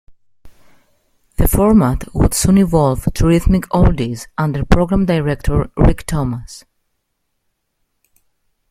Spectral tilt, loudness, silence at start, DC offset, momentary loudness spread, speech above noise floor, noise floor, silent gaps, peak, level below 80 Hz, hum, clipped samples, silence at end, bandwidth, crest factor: -6.5 dB/octave; -15 LUFS; 0.1 s; under 0.1%; 9 LU; 56 dB; -70 dBFS; none; 0 dBFS; -24 dBFS; none; under 0.1%; 2.1 s; 16 kHz; 16 dB